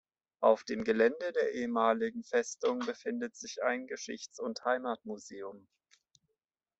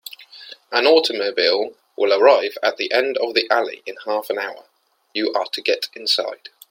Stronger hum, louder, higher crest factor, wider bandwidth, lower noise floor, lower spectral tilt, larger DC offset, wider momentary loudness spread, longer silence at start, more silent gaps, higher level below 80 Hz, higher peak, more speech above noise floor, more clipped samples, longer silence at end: neither; second, -33 LUFS vs -19 LUFS; about the same, 22 dB vs 20 dB; second, 8.2 kHz vs 16.5 kHz; first, -87 dBFS vs -42 dBFS; first, -3.5 dB/octave vs -1.5 dB/octave; neither; about the same, 13 LU vs 15 LU; first, 0.4 s vs 0.1 s; neither; about the same, -76 dBFS vs -76 dBFS; second, -12 dBFS vs 0 dBFS; first, 54 dB vs 23 dB; neither; first, 1.2 s vs 0.35 s